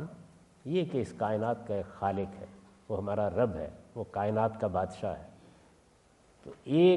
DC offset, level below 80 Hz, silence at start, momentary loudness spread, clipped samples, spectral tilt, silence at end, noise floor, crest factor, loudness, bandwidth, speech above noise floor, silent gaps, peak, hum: under 0.1%; -64 dBFS; 0 s; 18 LU; under 0.1%; -8 dB/octave; 0 s; -63 dBFS; 18 dB; -33 LUFS; 11 kHz; 33 dB; none; -14 dBFS; none